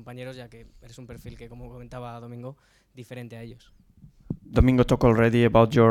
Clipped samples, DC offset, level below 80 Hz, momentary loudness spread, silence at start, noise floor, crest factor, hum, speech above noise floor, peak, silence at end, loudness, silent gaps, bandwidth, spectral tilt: under 0.1%; under 0.1%; -38 dBFS; 24 LU; 0.1 s; -38 dBFS; 20 dB; none; 14 dB; -4 dBFS; 0 s; -20 LUFS; none; 14.5 kHz; -8 dB/octave